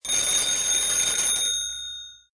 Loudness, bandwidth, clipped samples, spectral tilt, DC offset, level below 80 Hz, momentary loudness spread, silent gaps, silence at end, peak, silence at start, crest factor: -21 LUFS; 11 kHz; under 0.1%; 2 dB/octave; under 0.1%; -54 dBFS; 13 LU; none; 0.2 s; -10 dBFS; 0.05 s; 14 dB